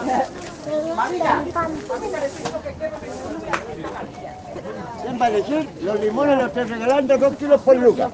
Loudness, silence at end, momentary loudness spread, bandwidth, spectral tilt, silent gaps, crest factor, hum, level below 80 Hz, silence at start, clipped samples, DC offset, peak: -21 LUFS; 0 s; 15 LU; 9.2 kHz; -5.5 dB/octave; none; 18 dB; none; -50 dBFS; 0 s; under 0.1%; under 0.1%; -2 dBFS